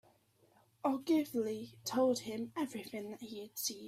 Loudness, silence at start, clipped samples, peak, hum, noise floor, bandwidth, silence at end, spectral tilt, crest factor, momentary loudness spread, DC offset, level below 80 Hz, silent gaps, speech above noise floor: -37 LUFS; 0.85 s; under 0.1%; -20 dBFS; none; -70 dBFS; 16 kHz; 0 s; -4 dB/octave; 18 dB; 12 LU; under 0.1%; -80 dBFS; none; 33 dB